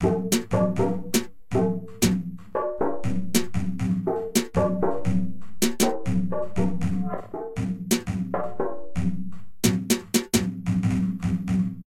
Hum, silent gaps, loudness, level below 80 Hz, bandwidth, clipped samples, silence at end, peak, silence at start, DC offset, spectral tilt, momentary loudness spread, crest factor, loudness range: none; none; -26 LUFS; -44 dBFS; 16 kHz; under 0.1%; 0 s; -6 dBFS; 0 s; 2%; -5.5 dB/octave; 7 LU; 18 dB; 2 LU